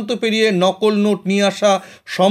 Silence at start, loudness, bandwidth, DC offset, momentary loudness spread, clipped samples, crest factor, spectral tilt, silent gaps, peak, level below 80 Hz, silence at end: 0 s; -16 LUFS; 14 kHz; under 0.1%; 4 LU; under 0.1%; 14 dB; -5 dB/octave; none; -2 dBFS; -70 dBFS; 0 s